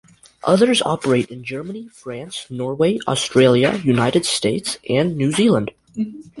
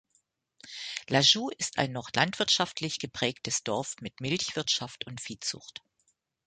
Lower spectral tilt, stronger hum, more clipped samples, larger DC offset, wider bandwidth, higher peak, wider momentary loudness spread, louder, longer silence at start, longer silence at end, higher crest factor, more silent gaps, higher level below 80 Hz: first, -5 dB/octave vs -2.5 dB/octave; neither; neither; neither; first, 11.5 kHz vs 9.6 kHz; first, -2 dBFS vs -8 dBFS; about the same, 15 LU vs 16 LU; first, -18 LUFS vs -29 LUFS; second, 0.45 s vs 0.65 s; second, 0 s vs 0.75 s; second, 18 dB vs 24 dB; neither; first, -54 dBFS vs -66 dBFS